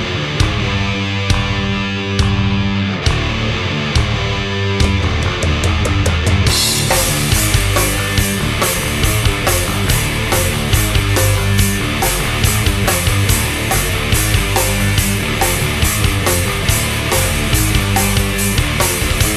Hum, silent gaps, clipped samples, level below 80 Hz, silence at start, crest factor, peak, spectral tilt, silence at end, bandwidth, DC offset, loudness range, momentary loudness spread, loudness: none; none; under 0.1%; -22 dBFS; 0 s; 14 dB; 0 dBFS; -3.5 dB/octave; 0 s; 13.5 kHz; under 0.1%; 2 LU; 4 LU; -15 LUFS